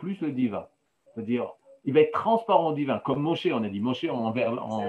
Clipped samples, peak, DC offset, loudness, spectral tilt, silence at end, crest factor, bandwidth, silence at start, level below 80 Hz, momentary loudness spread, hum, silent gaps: under 0.1%; -6 dBFS; under 0.1%; -26 LUFS; -8 dB/octave; 0 s; 20 dB; 8.2 kHz; 0 s; -74 dBFS; 13 LU; none; none